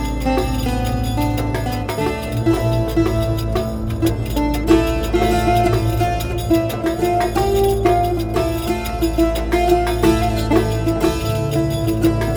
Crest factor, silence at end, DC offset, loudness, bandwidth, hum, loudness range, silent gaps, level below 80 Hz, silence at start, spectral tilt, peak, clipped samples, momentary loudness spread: 16 dB; 0 s; under 0.1%; -18 LUFS; over 20 kHz; none; 2 LU; none; -26 dBFS; 0 s; -6.5 dB/octave; -2 dBFS; under 0.1%; 5 LU